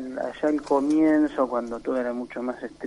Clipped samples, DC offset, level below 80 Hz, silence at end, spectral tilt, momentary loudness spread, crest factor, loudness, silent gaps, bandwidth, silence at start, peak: under 0.1%; under 0.1%; -56 dBFS; 0 s; -6 dB/octave; 11 LU; 14 dB; -25 LUFS; none; 11 kHz; 0 s; -10 dBFS